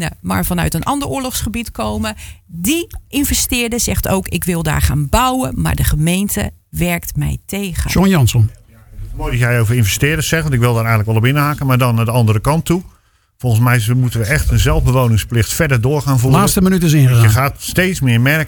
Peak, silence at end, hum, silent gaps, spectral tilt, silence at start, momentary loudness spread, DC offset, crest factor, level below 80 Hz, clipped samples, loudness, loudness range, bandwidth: 0 dBFS; 0 s; none; none; -5 dB/octave; 0 s; 9 LU; under 0.1%; 14 dB; -26 dBFS; under 0.1%; -15 LUFS; 5 LU; 19.5 kHz